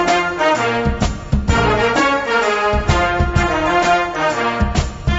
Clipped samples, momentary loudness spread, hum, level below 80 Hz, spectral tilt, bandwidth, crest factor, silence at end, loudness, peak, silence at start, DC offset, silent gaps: under 0.1%; 5 LU; none; -24 dBFS; -5 dB/octave; 8 kHz; 14 dB; 0 s; -16 LUFS; -2 dBFS; 0 s; under 0.1%; none